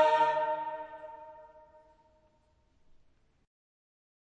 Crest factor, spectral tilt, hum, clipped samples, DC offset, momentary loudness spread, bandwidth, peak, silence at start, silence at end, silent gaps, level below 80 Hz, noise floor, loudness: 22 dB; -3.5 dB/octave; none; under 0.1%; under 0.1%; 25 LU; 9.2 kHz; -14 dBFS; 0 s; 2.8 s; none; -72 dBFS; -70 dBFS; -30 LUFS